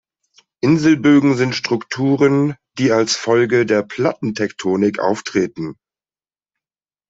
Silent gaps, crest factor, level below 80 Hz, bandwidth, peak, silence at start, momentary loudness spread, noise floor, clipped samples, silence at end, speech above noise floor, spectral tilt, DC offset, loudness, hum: none; 14 dB; -58 dBFS; 8 kHz; -2 dBFS; 0.65 s; 9 LU; under -90 dBFS; under 0.1%; 1.35 s; over 74 dB; -5.5 dB/octave; under 0.1%; -17 LUFS; none